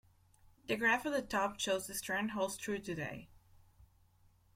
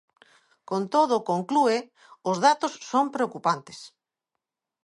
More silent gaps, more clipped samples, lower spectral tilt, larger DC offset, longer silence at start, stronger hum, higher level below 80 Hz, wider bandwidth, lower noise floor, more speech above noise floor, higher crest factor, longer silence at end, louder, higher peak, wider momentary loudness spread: neither; neither; second, -3 dB/octave vs -4.5 dB/octave; neither; about the same, 0.7 s vs 0.7 s; neither; first, -66 dBFS vs -80 dBFS; first, 16.5 kHz vs 11.5 kHz; second, -68 dBFS vs -85 dBFS; second, 32 dB vs 61 dB; about the same, 20 dB vs 20 dB; second, 0.7 s vs 1 s; second, -36 LUFS vs -25 LUFS; second, -20 dBFS vs -6 dBFS; about the same, 11 LU vs 10 LU